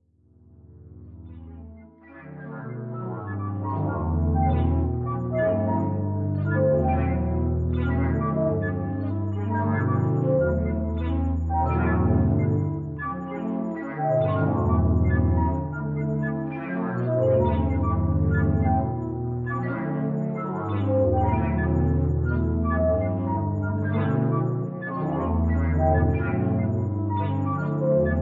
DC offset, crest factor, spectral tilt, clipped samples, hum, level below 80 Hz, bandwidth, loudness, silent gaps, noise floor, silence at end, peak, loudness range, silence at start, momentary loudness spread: under 0.1%; 16 dB; -11.5 dB/octave; under 0.1%; none; -38 dBFS; 3.8 kHz; -25 LUFS; none; -56 dBFS; 0 s; -8 dBFS; 2 LU; 0.75 s; 8 LU